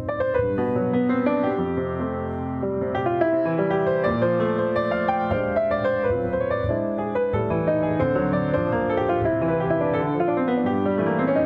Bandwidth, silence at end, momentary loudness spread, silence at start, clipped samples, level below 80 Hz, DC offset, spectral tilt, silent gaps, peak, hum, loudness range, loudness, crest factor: 5.2 kHz; 0 s; 4 LU; 0 s; under 0.1%; -46 dBFS; under 0.1%; -10 dB/octave; none; -8 dBFS; none; 1 LU; -23 LUFS; 14 dB